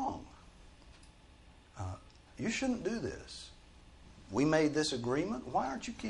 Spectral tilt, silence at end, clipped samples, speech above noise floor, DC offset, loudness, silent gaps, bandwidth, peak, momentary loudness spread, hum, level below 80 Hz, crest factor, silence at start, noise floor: -5 dB/octave; 0 s; under 0.1%; 25 dB; under 0.1%; -35 LUFS; none; 11.5 kHz; -18 dBFS; 21 LU; none; -58 dBFS; 20 dB; 0 s; -59 dBFS